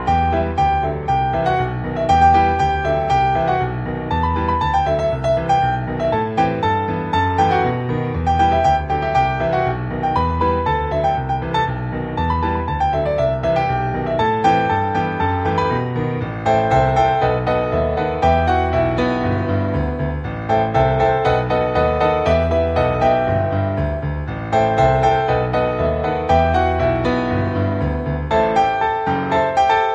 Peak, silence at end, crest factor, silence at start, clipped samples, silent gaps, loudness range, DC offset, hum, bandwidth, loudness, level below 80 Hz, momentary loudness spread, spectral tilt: -2 dBFS; 0 s; 14 dB; 0 s; under 0.1%; none; 2 LU; under 0.1%; none; 8 kHz; -18 LUFS; -30 dBFS; 6 LU; -7.5 dB/octave